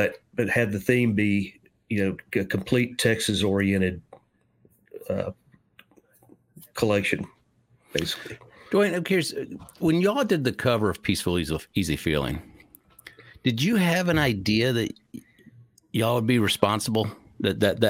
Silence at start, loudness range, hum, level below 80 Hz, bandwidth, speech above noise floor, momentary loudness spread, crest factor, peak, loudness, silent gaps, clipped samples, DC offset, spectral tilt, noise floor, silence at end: 0 s; 6 LU; none; -52 dBFS; 17 kHz; 39 dB; 12 LU; 22 dB; -2 dBFS; -25 LUFS; none; under 0.1%; under 0.1%; -5.5 dB/octave; -63 dBFS; 0 s